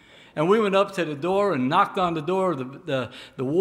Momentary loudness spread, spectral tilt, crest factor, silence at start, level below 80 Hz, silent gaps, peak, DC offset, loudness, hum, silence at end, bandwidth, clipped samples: 10 LU; -6.5 dB/octave; 18 dB; 0.35 s; -64 dBFS; none; -6 dBFS; under 0.1%; -23 LUFS; none; 0 s; 13 kHz; under 0.1%